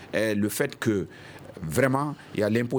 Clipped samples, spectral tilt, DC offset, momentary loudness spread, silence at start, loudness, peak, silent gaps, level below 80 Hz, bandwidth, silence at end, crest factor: under 0.1%; -5.5 dB/octave; under 0.1%; 14 LU; 0 s; -26 LUFS; -8 dBFS; none; -58 dBFS; over 20 kHz; 0 s; 18 dB